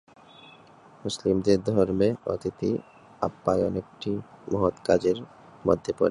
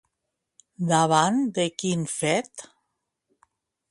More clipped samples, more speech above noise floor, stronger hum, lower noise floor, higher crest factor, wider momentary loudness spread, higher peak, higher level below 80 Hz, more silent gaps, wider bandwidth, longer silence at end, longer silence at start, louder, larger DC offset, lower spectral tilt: neither; second, 27 dB vs 58 dB; neither; second, -52 dBFS vs -82 dBFS; about the same, 20 dB vs 20 dB; about the same, 10 LU vs 12 LU; about the same, -6 dBFS vs -6 dBFS; first, -52 dBFS vs -68 dBFS; neither; about the same, 11.5 kHz vs 11.5 kHz; second, 0 s vs 1.25 s; first, 1.05 s vs 0.8 s; second, -27 LUFS vs -24 LUFS; neither; first, -6.5 dB/octave vs -4.5 dB/octave